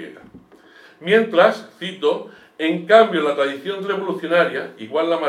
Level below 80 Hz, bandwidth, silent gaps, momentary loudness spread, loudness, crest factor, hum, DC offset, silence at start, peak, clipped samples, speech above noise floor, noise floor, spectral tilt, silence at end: -72 dBFS; 13 kHz; none; 15 LU; -19 LUFS; 18 dB; none; under 0.1%; 0 s; 0 dBFS; under 0.1%; 29 dB; -48 dBFS; -5.5 dB/octave; 0 s